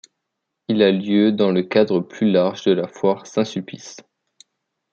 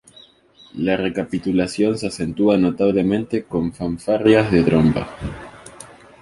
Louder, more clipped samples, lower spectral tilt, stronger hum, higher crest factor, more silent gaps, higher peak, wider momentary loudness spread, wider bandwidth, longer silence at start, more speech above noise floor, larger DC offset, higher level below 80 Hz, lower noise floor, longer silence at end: about the same, -19 LUFS vs -19 LUFS; neither; about the same, -6.5 dB/octave vs -7 dB/octave; neither; about the same, 18 dB vs 18 dB; neither; about the same, -2 dBFS vs -2 dBFS; about the same, 16 LU vs 17 LU; second, 7.6 kHz vs 11.5 kHz; about the same, 0.7 s vs 0.75 s; first, 60 dB vs 32 dB; neither; second, -66 dBFS vs -42 dBFS; first, -79 dBFS vs -50 dBFS; first, 1 s vs 0.35 s